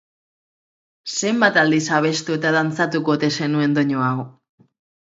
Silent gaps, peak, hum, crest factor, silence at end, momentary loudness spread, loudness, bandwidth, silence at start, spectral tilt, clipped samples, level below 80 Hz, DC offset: none; 0 dBFS; none; 20 dB; 0.75 s; 9 LU; -19 LUFS; 8 kHz; 1.05 s; -4.5 dB/octave; under 0.1%; -68 dBFS; under 0.1%